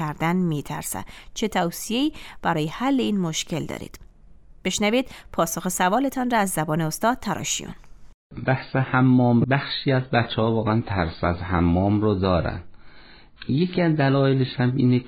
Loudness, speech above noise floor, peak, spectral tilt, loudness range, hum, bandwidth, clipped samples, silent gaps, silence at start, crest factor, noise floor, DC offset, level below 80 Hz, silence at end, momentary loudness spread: -23 LUFS; 25 dB; -6 dBFS; -5.5 dB/octave; 4 LU; none; 18.5 kHz; under 0.1%; 8.14-8.30 s; 0 s; 16 dB; -47 dBFS; under 0.1%; -44 dBFS; 0 s; 10 LU